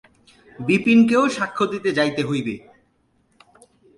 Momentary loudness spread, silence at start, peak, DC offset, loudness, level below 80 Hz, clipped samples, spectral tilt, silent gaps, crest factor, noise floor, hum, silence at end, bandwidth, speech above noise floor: 14 LU; 0.6 s; -6 dBFS; under 0.1%; -19 LUFS; -60 dBFS; under 0.1%; -5.5 dB/octave; none; 16 dB; -64 dBFS; none; 1.4 s; 11.5 kHz; 45 dB